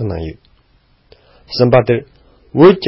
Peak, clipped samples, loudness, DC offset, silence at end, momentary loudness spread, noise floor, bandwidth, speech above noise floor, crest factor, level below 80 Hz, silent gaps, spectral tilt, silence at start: 0 dBFS; under 0.1%; -14 LUFS; under 0.1%; 0 s; 16 LU; -54 dBFS; 5.8 kHz; 42 dB; 14 dB; -38 dBFS; none; -10 dB/octave; 0 s